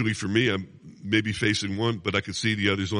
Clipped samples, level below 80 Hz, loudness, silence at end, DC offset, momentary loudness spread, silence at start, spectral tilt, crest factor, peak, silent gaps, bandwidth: under 0.1%; -56 dBFS; -25 LUFS; 0 s; under 0.1%; 6 LU; 0 s; -4.5 dB/octave; 18 dB; -8 dBFS; none; 11 kHz